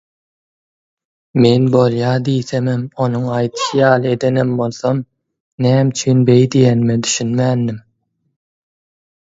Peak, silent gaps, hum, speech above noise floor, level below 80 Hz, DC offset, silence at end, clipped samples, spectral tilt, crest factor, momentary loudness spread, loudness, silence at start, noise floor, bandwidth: 0 dBFS; 5.40-5.58 s; none; 51 dB; -54 dBFS; under 0.1%; 1.5 s; under 0.1%; -6 dB/octave; 16 dB; 8 LU; -15 LUFS; 1.35 s; -65 dBFS; 8 kHz